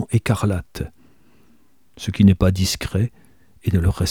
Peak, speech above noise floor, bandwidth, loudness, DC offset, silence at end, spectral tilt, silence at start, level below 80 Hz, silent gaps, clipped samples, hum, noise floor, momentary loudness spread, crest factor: -2 dBFS; 41 dB; 16.5 kHz; -20 LUFS; 0.3%; 0 s; -6 dB/octave; 0 s; -36 dBFS; none; under 0.1%; none; -59 dBFS; 16 LU; 18 dB